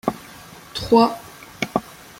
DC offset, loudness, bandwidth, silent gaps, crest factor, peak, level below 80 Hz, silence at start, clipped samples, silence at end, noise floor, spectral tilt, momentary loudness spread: under 0.1%; -21 LUFS; 16.5 kHz; none; 20 dB; -2 dBFS; -50 dBFS; 0.05 s; under 0.1%; 0.3 s; -42 dBFS; -5 dB/octave; 24 LU